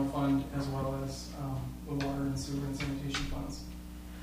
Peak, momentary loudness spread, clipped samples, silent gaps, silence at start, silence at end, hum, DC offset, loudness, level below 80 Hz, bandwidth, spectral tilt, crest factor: -18 dBFS; 11 LU; under 0.1%; none; 0 s; 0 s; 60 Hz at -45 dBFS; under 0.1%; -36 LUFS; -46 dBFS; 15.5 kHz; -6 dB/octave; 16 dB